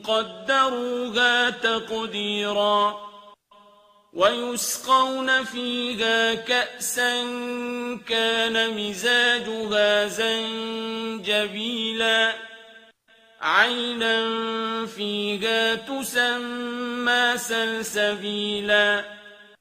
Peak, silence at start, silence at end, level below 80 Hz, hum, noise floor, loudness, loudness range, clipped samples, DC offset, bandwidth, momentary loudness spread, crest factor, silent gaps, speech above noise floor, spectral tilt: -4 dBFS; 0 s; 0.15 s; -66 dBFS; none; -56 dBFS; -23 LUFS; 2 LU; under 0.1%; under 0.1%; 15.5 kHz; 10 LU; 20 dB; none; 33 dB; -2 dB/octave